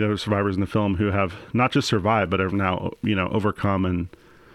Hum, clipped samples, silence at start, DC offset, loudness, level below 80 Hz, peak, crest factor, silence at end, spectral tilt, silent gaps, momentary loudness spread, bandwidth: none; under 0.1%; 0 s; under 0.1%; -23 LUFS; -48 dBFS; -6 dBFS; 16 dB; 0.45 s; -6.5 dB/octave; none; 5 LU; 12 kHz